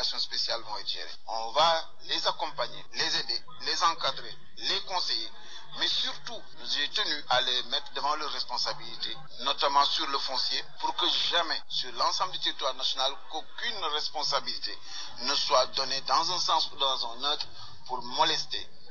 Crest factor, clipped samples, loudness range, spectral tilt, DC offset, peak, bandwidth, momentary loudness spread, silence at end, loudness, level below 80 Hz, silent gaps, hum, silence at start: 20 dB; under 0.1%; 3 LU; 1.5 dB/octave; 2%; -10 dBFS; 7.6 kHz; 11 LU; 0 s; -29 LUFS; -70 dBFS; none; none; 0 s